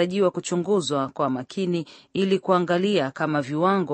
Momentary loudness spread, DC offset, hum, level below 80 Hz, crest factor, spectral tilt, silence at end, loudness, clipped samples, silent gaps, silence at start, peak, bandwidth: 6 LU; under 0.1%; none; -70 dBFS; 18 dB; -5.5 dB/octave; 0 s; -24 LUFS; under 0.1%; none; 0 s; -6 dBFS; 8.8 kHz